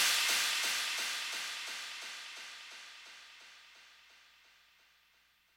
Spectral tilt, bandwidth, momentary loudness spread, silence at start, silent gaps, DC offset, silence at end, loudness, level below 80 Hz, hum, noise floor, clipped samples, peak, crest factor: 3.5 dB/octave; 16.5 kHz; 24 LU; 0 s; none; under 0.1%; 1.4 s; -34 LUFS; -88 dBFS; none; -70 dBFS; under 0.1%; -18 dBFS; 22 dB